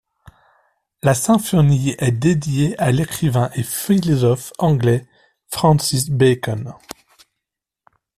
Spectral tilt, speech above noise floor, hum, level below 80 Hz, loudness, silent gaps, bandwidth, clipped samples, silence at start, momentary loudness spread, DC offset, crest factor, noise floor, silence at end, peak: -6 dB/octave; 66 dB; none; -46 dBFS; -18 LUFS; none; 15 kHz; under 0.1%; 1.05 s; 10 LU; under 0.1%; 16 dB; -82 dBFS; 1.25 s; -2 dBFS